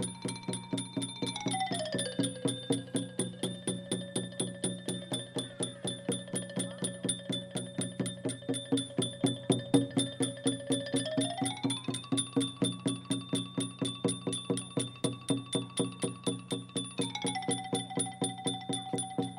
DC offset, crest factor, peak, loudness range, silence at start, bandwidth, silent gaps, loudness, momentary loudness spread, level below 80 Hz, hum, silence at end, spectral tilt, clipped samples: under 0.1%; 24 dB; -12 dBFS; 4 LU; 0 s; 16 kHz; none; -34 LUFS; 5 LU; -74 dBFS; none; 0 s; -4 dB/octave; under 0.1%